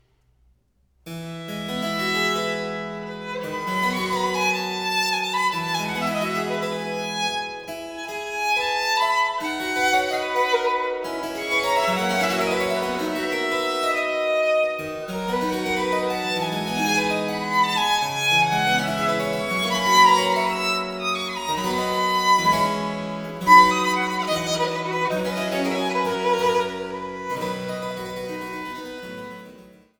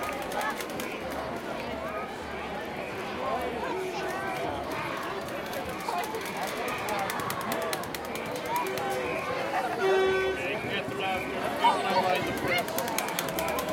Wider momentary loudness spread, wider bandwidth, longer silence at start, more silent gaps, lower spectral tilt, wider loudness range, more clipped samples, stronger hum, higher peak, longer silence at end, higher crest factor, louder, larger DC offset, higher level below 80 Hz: first, 13 LU vs 9 LU; first, over 20 kHz vs 17 kHz; first, 1.05 s vs 0 s; neither; about the same, -3.5 dB/octave vs -3.5 dB/octave; about the same, 6 LU vs 6 LU; neither; neither; first, -2 dBFS vs -6 dBFS; first, 0.3 s vs 0 s; about the same, 20 dB vs 24 dB; first, -22 LUFS vs -30 LUFS; neither; about the same, -56 dBFS vs -56 dBFS